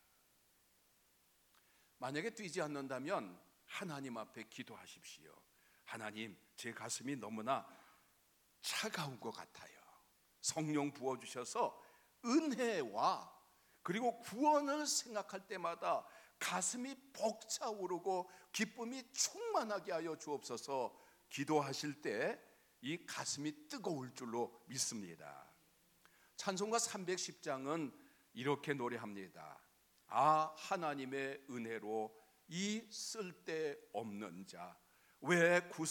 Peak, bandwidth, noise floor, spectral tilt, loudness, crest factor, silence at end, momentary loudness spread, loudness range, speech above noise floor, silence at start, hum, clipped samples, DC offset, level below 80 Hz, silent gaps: -20 dBFS; 19 kHz; -74 dBFS; -3.5 dB/octave; -41 LUFS; 22 dB; 0 s; 15 LU; 7 LU; 33 dB; 2 s; none; under 0.1%; under 0.1%; -88 dBFS; none